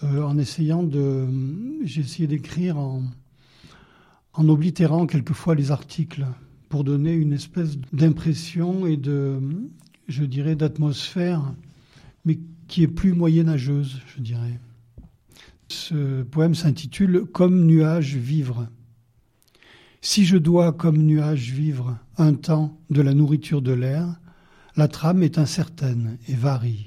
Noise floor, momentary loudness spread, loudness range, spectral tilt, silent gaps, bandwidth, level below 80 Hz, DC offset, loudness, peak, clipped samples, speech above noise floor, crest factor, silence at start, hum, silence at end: -61 dBFS; 12 LU; 5 LU; -7.5 dB/octave; none; 12 kHz; -50 dBFS; under 0.1%; -22 LUFS; -6 dBFS; under 0.1%; 40 dB; 16 dB; 0 s; none; 0 s